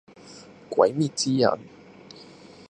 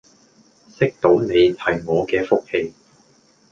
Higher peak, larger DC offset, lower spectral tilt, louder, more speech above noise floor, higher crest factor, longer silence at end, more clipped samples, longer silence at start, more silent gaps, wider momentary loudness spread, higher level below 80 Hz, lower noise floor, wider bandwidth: about the same, -4 dBFS vs -2 dBFS; neither; second, -5 dB/octave vs -7 dB/octave; second, -24 LUFS vs -19 LUFS; second, 25 dB vs 38 dB; first, 24 dB vs 18 dB; second, 0.45 s vs 0.8 s; neither; second, 0.25 s vs 0.8 s; neither; first, 24 LU vs 9 LU; second, -68 dBFS vs -52 dBFS; second, -48 dBFS vs -56 dBFS; first, 11.5 kHz vs 7.4 kHz